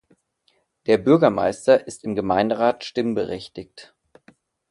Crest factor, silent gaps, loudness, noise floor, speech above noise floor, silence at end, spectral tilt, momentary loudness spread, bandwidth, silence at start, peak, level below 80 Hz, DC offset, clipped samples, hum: 20 dB; none; -20 LUFS; -67 dBFS; 46 dB; 0.85 s; -6 dB/octave; 16 LU; 11.5 kHz; 0.9 s; -2 dBFS; -56 dBFS; under 0.1%; under 0.1%; none